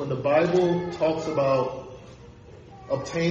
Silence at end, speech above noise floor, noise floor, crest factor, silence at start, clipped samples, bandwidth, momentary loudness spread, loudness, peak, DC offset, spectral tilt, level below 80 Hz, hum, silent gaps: 0 s; 23 dB; -46 dBFS; 16 dB; 0 s; under 0.1%; 8 kHz; 20 LU; -24 LUFS; -8 dBFS; under 0.1%; -6.5 dB/octave; -56 dBFS; none; none